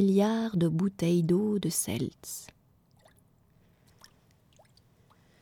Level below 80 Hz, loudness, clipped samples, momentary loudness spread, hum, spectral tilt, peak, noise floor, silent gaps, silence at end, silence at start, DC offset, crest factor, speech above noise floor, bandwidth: -64 dBFS; -29 LUFS; under 0.1%; 14 LU; none; -6 dB/octave; -14 dBFS; -64 dBFS; none; 2.95 s; 0 s; under 0.1%; 16 dB; 37 dB; 18 kHz